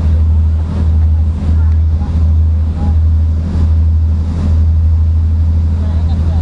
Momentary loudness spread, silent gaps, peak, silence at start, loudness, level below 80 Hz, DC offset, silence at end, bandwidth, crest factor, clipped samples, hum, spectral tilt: 3 LU; none; -2 dBFS; 0 s; -13 LUFS; -16 dBFS; under 0.1%; 0 s; 4 kHz; 8 dB; under 0.1%; none; -9.5 dB/octave